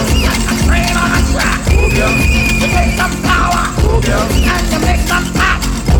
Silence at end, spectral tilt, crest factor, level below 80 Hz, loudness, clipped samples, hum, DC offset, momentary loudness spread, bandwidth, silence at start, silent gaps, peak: 0 s; -4.5 dB/octave; 12 dB; -16 dBFS; -12 LUFS; under 0.1%; none; under 0.1%; 2 LU; over 20 kHz; 0 s; none; 0 dBFS